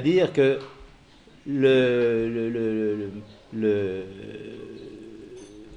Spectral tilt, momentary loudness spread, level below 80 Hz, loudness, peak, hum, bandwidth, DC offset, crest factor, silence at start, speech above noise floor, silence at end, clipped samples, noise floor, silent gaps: -7 dB/octave; 23 LU; -56 dBFS; -24 LUFS; -8 dBFS; none; 9.6 kHz; under 0.1%; 18 dB; 0 s; 29 dB; 0 s; under 0.1%; -52 dBFS; none